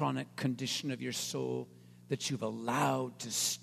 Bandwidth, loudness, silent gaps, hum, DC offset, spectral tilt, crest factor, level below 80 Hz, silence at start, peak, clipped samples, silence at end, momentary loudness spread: 14 kHz; -35 LUFS; none; 60 Hz at -55 dBFS; under 0.1%; -3.5 dB/octave; 18 dB; -78 dBFS; 0 s; -16 dBFS; under 0.1%; 0 s; 7 LU